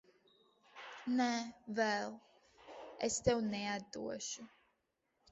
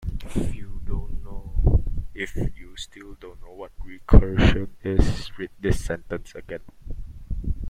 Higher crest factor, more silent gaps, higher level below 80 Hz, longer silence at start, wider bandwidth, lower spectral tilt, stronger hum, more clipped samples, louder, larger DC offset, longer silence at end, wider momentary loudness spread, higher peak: about the same, 22 dB vs 22 dB; neither; second, -66 dBFS vs -26 dBFS; first, 0.75 s vs 0 s; second, 7.6 kHz vs 10.5 kHz; second, -3.5 dB/octave vs -7 dB/octave; neither; neither; second, -38 LUFS vs -25 LUFS; neither; first, 0.85 s vs 0 s; about the same, 20 LU vs 21 LU; second, -18 dBFS vs 0 dBFS